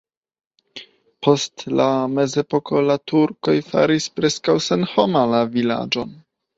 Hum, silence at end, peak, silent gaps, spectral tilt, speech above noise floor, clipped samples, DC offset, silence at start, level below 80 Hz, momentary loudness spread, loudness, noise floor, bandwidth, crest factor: none; 0.45 s; -2 dBFS; none; -5 dB/octave; 24 dB; under 0.1%; under 0.1%; 0.75 s; -60 dBFS; 7 LU; -19 LUFS; -42 dBFS; 8 kHz; 18 dB